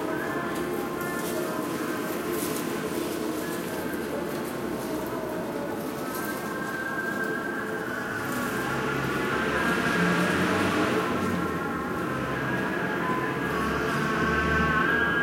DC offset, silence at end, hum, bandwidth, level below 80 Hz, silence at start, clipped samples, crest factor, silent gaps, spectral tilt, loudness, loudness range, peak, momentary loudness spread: under 0.1%; 0 s; none; 16.5 kHz; -48 dBFS; 0 s; under 0.1%; 16 dB; none; -5 dB/octave; -28 LUFS; 5 LU; -12 dBFS; 7 LU